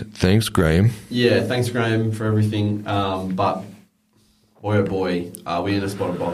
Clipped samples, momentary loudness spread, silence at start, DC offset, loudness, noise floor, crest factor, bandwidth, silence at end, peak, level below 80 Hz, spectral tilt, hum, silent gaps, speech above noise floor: under 0.1%; 7 LU; 0 s; under 0.1%; -21 LUFS; -60 dBFS; 18 dB; 14.5 kHz; 0 s; -4 dBFS; -42 dBFS; -6.5 dB/octave; none; none; 40 dB